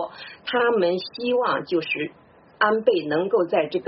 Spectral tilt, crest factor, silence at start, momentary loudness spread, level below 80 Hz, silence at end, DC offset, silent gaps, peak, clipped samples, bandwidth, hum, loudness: -2.5 dB/octave; 18 dB; 0 s; 7 LU; -68 dBFS; 0 s; under 0.1%; none; -6 dBFS; under 0.1%; 5.8 kHz; none; -23 LUFS